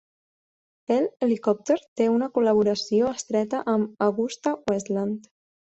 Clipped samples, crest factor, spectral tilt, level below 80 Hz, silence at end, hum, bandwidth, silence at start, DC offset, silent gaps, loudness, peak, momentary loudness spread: under 0.1%; 16 dB; -5.5 dB/octave; -66 dBFS; 0.5 s; none; 8.2 kHz; 0.9 s; under 0.1%; 1.88-1.96 s; -24 LUFS; -10 dBFS; 6 LU